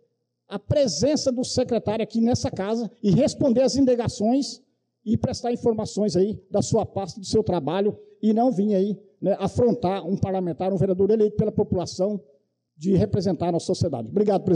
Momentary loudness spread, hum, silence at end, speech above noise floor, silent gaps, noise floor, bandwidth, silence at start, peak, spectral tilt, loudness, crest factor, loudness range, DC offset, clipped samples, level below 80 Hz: 7 LU; none; 0 s; 45 dB; none; -67 dBFS; 10.5 kHz; 0.5 s; -12 dBFS; -6.5 dB/octave; -23 LUFS; 12 dB; 2 LU; under 0.1%; under 0.1%; -52 dBFS